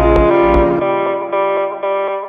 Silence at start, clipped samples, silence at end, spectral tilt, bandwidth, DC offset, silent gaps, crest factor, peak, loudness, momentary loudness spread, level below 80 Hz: 0 s; under 0.1%; 0 s; -9 dB/octave; 4.9 kHz; under 0.1%; none; 14 dB; 0 dBFS; -14 LUFS; 7 LU; -24 dBFS